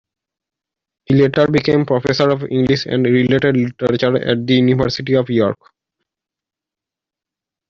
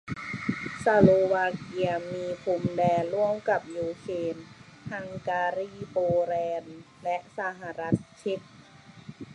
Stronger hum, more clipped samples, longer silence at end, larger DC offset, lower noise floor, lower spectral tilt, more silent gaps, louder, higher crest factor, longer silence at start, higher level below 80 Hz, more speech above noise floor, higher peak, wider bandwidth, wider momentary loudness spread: neither; neither; first, 2.15 s vs 0 s; neither; first, -87 dBFS vs -51 dBFS; about the same, -7 dB/octave vs -7 dB/octave; neither; first, -15 LUFS vs -28 LUFS; second, 16 dB vs 24 dB; first, 1.1 s vs 0.05 s; first, -48 dBFS vs -58 dBFS; first, 72 dB vs 24 dB; first, 0 dBFS vs -4 dBFS; second, 7.4 kHz vs 11 kHz; second, 4 LU vs 14 LU